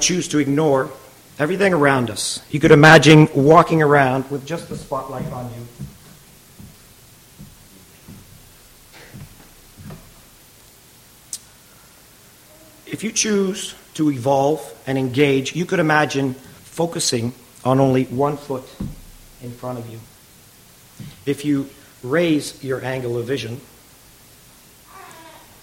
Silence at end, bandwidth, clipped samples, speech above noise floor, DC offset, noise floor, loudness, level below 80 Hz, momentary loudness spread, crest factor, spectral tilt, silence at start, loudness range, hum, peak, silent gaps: 0.35 s; 16.5 kHz; under 0.1%; 30 dB; under 0.1%; -48 dBFS; -17 LUFS; -50 dBFS; 24 LU; 20 dB; -5 dB/octave; 0 s; 22 LU; none; 0 dBFS; none